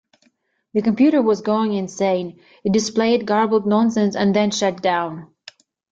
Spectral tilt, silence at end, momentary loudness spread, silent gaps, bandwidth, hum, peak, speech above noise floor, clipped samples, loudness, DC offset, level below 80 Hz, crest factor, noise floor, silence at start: -5.5 dB/octave; 0.65 s; 9 LU; none; 7.8 kHz; none; -6 dBFS; 46 dB; under 0.1%; -19 LUFS; under 0.1%; -60 dBFS; 14 dB; -64 dBFS; 0.75 s